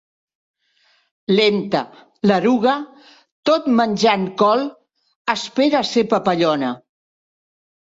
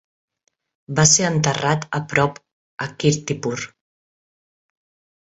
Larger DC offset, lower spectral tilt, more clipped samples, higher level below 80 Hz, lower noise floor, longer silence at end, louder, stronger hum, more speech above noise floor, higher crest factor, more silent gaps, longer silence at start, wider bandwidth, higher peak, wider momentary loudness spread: neither; first, -5.5 dB/octave vs -3.5 dB/octave; neither; second, -64 dBFS vs -54 dBFS; second, -61 dBFS vs under -90 dBFS; second, 1.15 s vs 1.55 s; about the same, -18 LUFS vs -19 LUFS; neither; second, 44 dB vs over 71 dB; about the same, 18 dB vs 22 dB; about the same, 3.31-3.43 s, 5.16-5.25 s vs 2.52-2.78 s; first, 1.3 s vs 0.9 s; about the same, 8 kHz vs 8.2 kHz; about the same, -2 dBFS vs -2 dBFS; second, 11 LU vs 16 LU